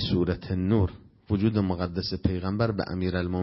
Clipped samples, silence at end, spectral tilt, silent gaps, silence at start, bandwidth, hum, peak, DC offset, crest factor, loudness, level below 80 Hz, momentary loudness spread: under 0.1%; 0 s; -10.5 dB/octave; none; 0 s; 5.8 kHz; none; -8 dBFS; under 0.1%; 18 dB; -27 LUFS; -44 dBFS; 4 LU